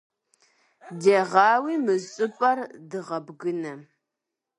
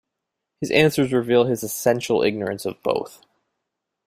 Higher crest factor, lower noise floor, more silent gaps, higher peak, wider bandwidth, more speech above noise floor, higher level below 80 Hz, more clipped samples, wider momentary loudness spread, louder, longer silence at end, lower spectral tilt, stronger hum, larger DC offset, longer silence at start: about the same, 22 dB vs 20 dB; about the same, -85 dBFS vs -82 dBFS; neither; about the same, -4 dBFS vs -2 dBFS; second, 11 kHz vs 16 kHz; about the same, 62 dB vs 61 dB; second, -80 dBFS vs -60 dBFS; neither; first, 17 LU vs 9 LU; second, -24 LUFS vs -21 LUFS; second, 0.8 s vs 0.95 s; about the same, -5 dB/octave vs -5 dB/octave; neither; neither; first, 0.85 s vs 0.6 s